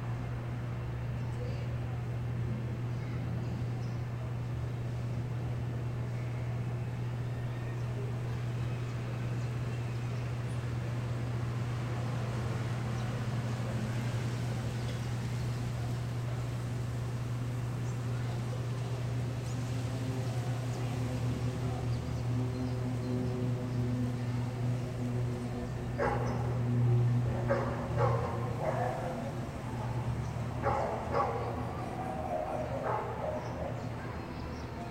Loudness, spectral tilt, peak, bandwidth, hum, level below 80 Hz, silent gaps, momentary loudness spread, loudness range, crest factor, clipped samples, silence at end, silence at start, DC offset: -35 LUFS; -7.5 dB/octave; -16 dBFS; 9.8 kHz; none; -48 dBFS; none; 5 LU; 4 LU; 18 dB; under 0.1%; 0 s; 0 s; under 0.1%